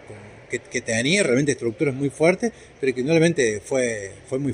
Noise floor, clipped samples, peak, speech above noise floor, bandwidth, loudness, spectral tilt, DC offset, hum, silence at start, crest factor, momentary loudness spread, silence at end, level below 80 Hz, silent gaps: -42 dBFS; under 0.1%; -4 dBFS; 20 dB; 11 kHz; -22 LUFS; -4.5 dB/octave; under 0.1%; none; 0 s; 18 dB; 13 LU; 0 s; -58 dBFS; none